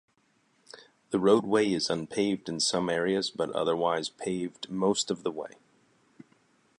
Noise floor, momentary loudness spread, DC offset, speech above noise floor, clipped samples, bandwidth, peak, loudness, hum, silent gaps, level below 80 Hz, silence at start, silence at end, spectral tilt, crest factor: -69 dBFS; 10 LU; under 0.1%; 41 dB; under 0.1%; 11.5 kHz; -8 dBFS; -28 LUFS; none; none; -68 dBFS; 0.75 s; 1.3 s; -4 dB/octave; 22 dB